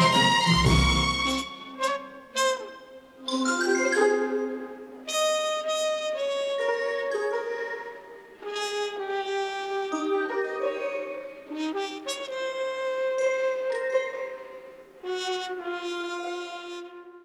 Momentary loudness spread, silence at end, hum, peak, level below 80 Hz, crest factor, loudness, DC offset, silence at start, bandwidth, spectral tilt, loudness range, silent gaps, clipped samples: 16 LU; 0 s; none; -8 dBFS; -42 dBFS; 20 dB; -27 LUFS; under 0.1%; 0 s; 14.5 kHz; -4 dB/octave; 4 LU; none; under 0.1%